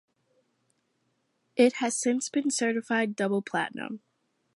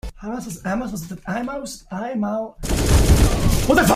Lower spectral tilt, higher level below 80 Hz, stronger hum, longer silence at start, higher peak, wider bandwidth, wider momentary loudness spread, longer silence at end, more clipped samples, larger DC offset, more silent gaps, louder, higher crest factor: second, -3.5 dB/octave vs -5 dB/octave; second, -84 dBFS vs -24 dBFS; neither; first, 1.55 s vs 0.05 s; second, -10 dBFS vs -2 dBFS; second, 11.5 kHz vs 16 kHz; about the same, 13 LU vs 14 LU; first, 0.6 s vs 0 s; neither; neither; neither; second, -27 LUFS vs -21 LUFS; about the same, 20 dB vs 18 dB